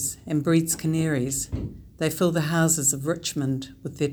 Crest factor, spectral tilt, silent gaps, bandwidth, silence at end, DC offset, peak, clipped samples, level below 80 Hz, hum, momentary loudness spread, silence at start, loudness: 16 dB; -4.5 dB/octave; none; over 20 kHz; 0 s; under 0.1%; -8 dBFS; under 0.1%; -46 dBFS; none; 11 LU; 0 s; -24 LUFS